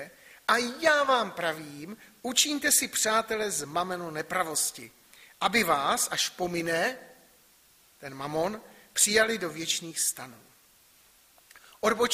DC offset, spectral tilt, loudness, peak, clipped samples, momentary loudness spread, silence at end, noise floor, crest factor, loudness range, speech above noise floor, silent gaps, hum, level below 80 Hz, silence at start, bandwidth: under 0.1%; -1.5 dB/octave; -27 LUFS; -6 dBFS; under 0.1%; 19 LU; 0 s; -61 dBFS; 24 dB; 3 LU; 32 dB; none; none; -66 dBFS; 0 s; 15.5 kHz